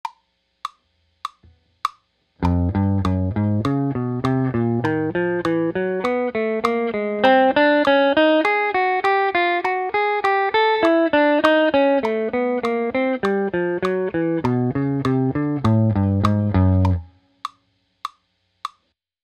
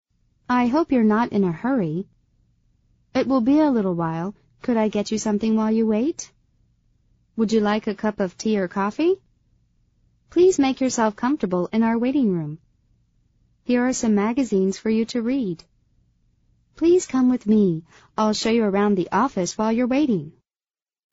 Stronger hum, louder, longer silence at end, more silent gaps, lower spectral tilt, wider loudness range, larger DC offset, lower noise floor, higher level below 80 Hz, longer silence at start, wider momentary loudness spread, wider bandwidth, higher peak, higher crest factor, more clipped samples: neither; about the same, -19 LUFS vs -21 LUFS; second, 0.55 s vs 0.8 s; neither; first, -7.5 dB/octave vs -6 dB/octave; first, 6 LU vs 3 LU; neither; second, -68 dBFS vs under -90 dBFS; first, -44 dBFS vs -56 dBFS; second, 0.05 s vs 0.5 s; first, 19 LU vs 10 LU; first, 9.8 kHz vs 8 kHz; first, 0 dBFS vs -8 dBFS; first, 20 dB vs 14 dB; neither